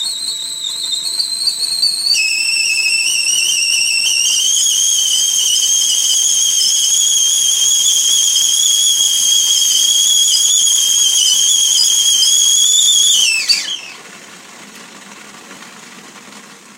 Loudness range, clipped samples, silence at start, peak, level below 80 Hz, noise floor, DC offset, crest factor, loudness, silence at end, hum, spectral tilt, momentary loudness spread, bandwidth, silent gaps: 5 LU; under 0.1%; 0 s; 0 dBFS; -72 dBFS; -37 dBFS; under 0.1%; 14 dB; -10 LUFS; 0.25 s; none; 4.5 dB/octave; 7 LU; 16 kHz; none